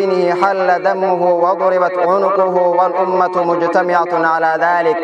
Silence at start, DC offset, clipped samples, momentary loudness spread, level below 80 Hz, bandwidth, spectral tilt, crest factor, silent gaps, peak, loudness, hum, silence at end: 0 s; under 0.1%; under 0.1%; 1 LU; -68 dBFS; 8.2 kHz; -6.5 dB/octave; 14 dB; none; 0 dBFS; -14 LUFS; none; 0 s